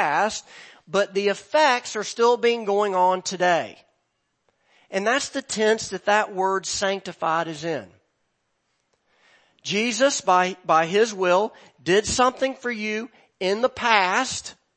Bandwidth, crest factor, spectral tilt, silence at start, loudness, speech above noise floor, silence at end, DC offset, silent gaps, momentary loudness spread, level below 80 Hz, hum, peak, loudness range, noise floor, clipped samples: 8.8 kHz; 22 dB; -3 dB/octave; 0 s; -22 LUFS; 51 dB; 0.25 s; under 0.1%; none; 10 LU; -58 dBFS; none; -2 dBFS; 5 LU; -74 dBFS; under 0.1%